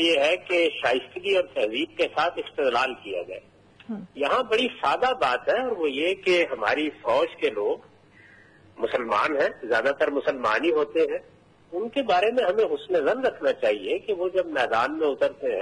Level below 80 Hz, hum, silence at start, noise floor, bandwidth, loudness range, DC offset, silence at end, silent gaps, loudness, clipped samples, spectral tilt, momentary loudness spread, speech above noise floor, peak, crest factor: -64 dBFS; none; 0 s; -53 dBFS; 11 kHz; 2 LU; under 0.1%; 0 s; none; -24 LUFS; under 0.1%; -4 dB/octave; 7 LU; 29 dB; -8 dBFS; 16 dB